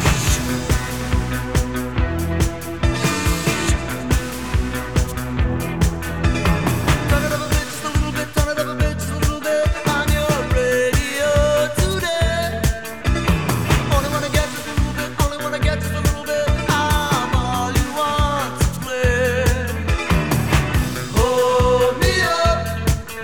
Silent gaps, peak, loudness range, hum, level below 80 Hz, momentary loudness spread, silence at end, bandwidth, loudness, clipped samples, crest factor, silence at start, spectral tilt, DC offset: none; -2 dBFS; 3 LU; none; -24 dBFS; 5 LU; 0 s; over 20 kHz; -19 LUFS; under 0.1%; 18 dB; 0 s; -5 dB/octave; 1%